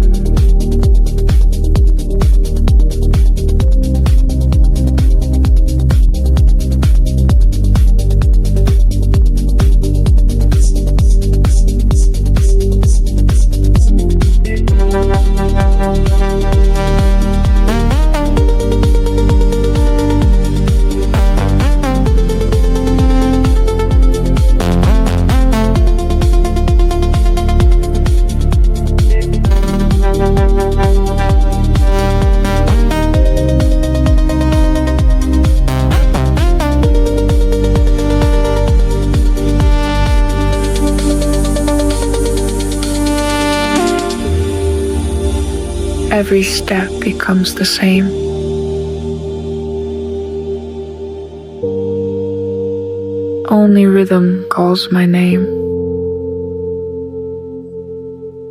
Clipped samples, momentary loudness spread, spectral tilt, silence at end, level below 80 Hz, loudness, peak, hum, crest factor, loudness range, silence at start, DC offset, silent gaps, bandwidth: under 0.1%; 7 LU; -6.5 dB/octave; 0 s; -12 dBFS; -13 LUFS; 0 dBFS; none; 10 dB; 3 LU; 0 s; under 0.1%; none; 13 kHz